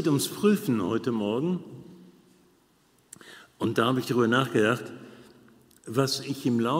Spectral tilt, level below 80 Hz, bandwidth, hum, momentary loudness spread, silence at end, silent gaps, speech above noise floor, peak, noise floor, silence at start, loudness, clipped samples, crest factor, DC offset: -5.5 dB/octave; -70 dBFS; 16 kHz; none; 23 LU; 0 s; none; 38 dB; -8 dBFS; -64 dBFS; 0 s; -26 LUFS; under 0.1%; 20 dB; under 0.1%